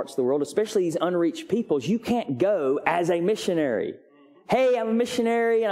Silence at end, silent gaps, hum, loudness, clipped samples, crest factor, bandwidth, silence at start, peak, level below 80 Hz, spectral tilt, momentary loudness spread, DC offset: 0 s; none; none; -24 LUFS; under 0.1%; 20 dB; 15.5 kHz; 0 s; -4 dBFS; -66 dBFS; -5.5 dB/octave; 4 LU; under 0.1%